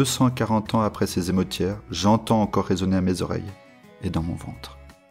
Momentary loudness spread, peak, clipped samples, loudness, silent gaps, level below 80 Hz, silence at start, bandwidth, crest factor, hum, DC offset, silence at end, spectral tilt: 13 LU; -8 dBFS; under 0.1%; -24 LUFS; none; -46 dBFS; 0 s; 16 kHz; 16 dB; none; under 0.1%; 0.2 s; -5.5 dB/octave